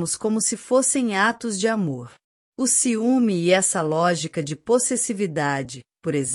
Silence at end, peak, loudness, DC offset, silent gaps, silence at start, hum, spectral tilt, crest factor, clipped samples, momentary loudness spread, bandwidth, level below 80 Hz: 0 s; -4 dBFS; -21 LUFS; under 0.1%; 2.24-2.52 s; 0 s; none; -3.5 dB/octave; 18 dB; under 0.1%; 10 LU; 14 kHz; -66 dBFS